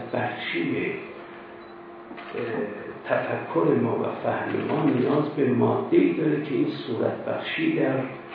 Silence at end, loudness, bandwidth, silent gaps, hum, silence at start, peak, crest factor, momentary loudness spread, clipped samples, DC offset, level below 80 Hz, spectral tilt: 0 s; -25 LUFS; 5 kHz; none; none; 0 s; -8 dBFS; 18 dB; 18 LU; under 0.1%; under 0.1%; -72 dBFS; -10 dB/octave